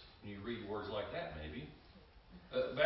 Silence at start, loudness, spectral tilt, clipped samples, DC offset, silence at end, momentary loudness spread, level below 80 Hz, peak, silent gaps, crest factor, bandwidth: 0 s; -44 LUFS; -3.5 dB/octave; under 0.1%; under 0.1%; 0 s; 20 LU; -60 dBFS; -20 dBFS; none; 22 dB; 5.6 kHz